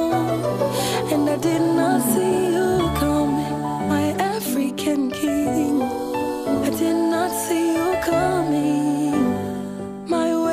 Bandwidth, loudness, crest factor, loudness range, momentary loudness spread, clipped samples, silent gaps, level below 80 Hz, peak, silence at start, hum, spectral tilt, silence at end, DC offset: 15.5 kHz; -21 LUFS; 14 dB; 2 LU; 5 LU; under 0.1%; none; -44 dBFS; -6 dBFS; 0 s; none; -5.5 dB/octave; 0 s; under 0.1%